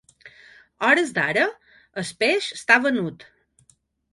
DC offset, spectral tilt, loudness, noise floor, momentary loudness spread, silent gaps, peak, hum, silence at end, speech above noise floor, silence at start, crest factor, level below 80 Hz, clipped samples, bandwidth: under 0.1%; -4 dB/octave; -21 LUFS; -62 dBFS; 14 LU; none; -2 dBFS; none; 1 s; 40 dB; 0.25 s; 22 dB; -68 dBFS; under 0.1%; 11.5 kHz